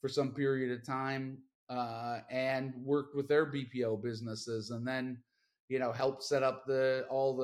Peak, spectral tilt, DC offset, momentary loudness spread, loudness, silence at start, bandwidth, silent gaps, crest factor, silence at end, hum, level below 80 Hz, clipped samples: -18 dBFS; -6 dB/octave; under 0.1%; 9 LU; -35 LUFS; 0.05 s; 13 kHz; 1.55-1.67 s, 5.60-5.68 s; 16 dB; 0 s; none; -78 dBFS; under 0.1%